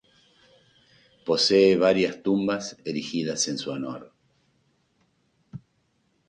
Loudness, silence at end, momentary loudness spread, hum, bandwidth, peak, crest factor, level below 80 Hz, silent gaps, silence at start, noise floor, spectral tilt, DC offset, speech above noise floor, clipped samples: -24 LUFS; 0.7 s; 25 LU; none; 10 kHz; -8 dBFS; 20 dB; -66 dBFS; none; 1.25 s; -70 dBFS; -4 dB/octave; under 0.1%; 46 dB; under 0.1%